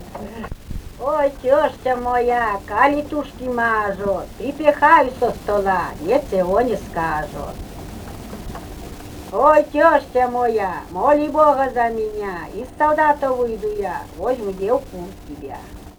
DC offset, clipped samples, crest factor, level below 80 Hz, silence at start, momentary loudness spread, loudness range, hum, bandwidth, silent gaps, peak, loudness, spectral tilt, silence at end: under 0.1%; under 0.1%; 18 dB; -40 dBFS; 0 s; 19 LU; 5 LU; none; over 20 kHz; none; 0 dBFS; -19 LUFS; -6 dB/octave; 0.05 s